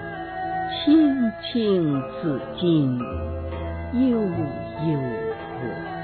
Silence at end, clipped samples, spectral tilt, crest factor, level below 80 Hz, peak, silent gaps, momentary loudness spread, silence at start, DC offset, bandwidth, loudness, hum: 0 s; under 0.1%; -11 dB/octave; 16 dB; -46 dBFS; -8 dBFS; none; 12 LU; 0 s; under 0.1%; 4.5 kHz; -24 LUFS; none